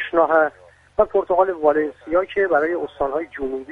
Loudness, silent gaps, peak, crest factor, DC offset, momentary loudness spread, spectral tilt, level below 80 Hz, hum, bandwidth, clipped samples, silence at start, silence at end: -20 LUFS; none; -2 dBFS; 18 dB; under 0.1%; 8 LU; -7 dB/octave; -48 dBFS; none; 4.8 kHz; under 0.1%; 0 s; 0 s